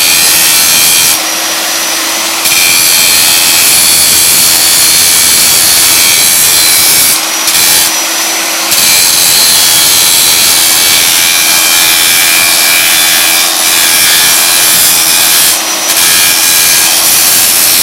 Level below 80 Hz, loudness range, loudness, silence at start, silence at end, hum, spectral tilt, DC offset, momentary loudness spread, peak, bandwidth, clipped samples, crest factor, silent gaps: -44 dBFS; 2 LU; -3 LUFS; 0 s; 0 s; none; 1.5 dB/octave; under 0.1%; 5 LU; 0 dBFS; over 20 kHz; 5%; 6 dB; none